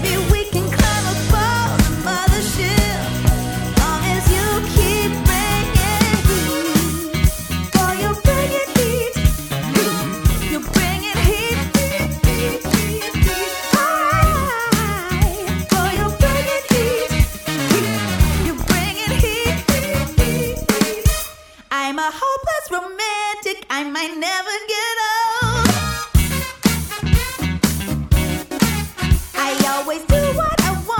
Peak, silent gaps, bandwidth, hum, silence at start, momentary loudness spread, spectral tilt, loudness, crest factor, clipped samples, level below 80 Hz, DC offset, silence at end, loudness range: 0 dBFS; none; 19 kHz; none; 0 s; 5 LU; -4.5 dB/octave; -18 LUFS; 16 dB; under 0.1%; -24 dBFS; under 0.1%; 0 s; 3 LU